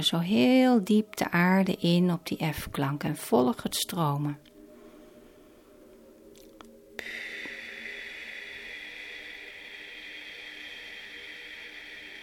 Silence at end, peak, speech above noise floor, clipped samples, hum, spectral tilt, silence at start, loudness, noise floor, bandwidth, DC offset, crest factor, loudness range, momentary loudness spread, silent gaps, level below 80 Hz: 0 s; -12 dBFS; 29 dB; under 0.1%; none; -5.5 dB/octave; 0 s; -28 LUFS; -55 dBFS; 17.5 kHz; under 0.1%; 18 dB; 16 LU; 18 LU; none; -60 dBFS